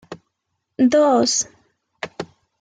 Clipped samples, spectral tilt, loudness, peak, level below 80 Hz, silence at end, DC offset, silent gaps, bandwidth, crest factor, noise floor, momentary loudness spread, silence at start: under 0.1%; -3 dB/octave; -17 LUFS; -6 dBFS; -64 dBFS; 0.35 s; under 0.1%; none; 9.6 kHz; 16 dB; -76 dBFS; 20 LU; 0.1 s